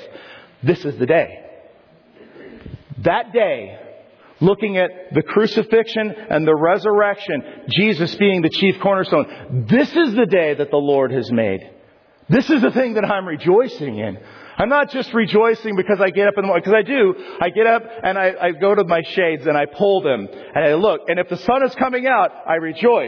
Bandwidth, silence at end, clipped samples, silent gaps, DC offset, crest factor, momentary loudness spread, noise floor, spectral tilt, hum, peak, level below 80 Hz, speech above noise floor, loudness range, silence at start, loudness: 5.4 kHz; 0 s; under 0.1%; none; under 0.1%; 14 dB; 8 LU; -51 dBFS; -7.5 dB/octave; none; -4 dBFS; -56 dBFS; 34 dB; 5 LU; 0 s; -17 LUFS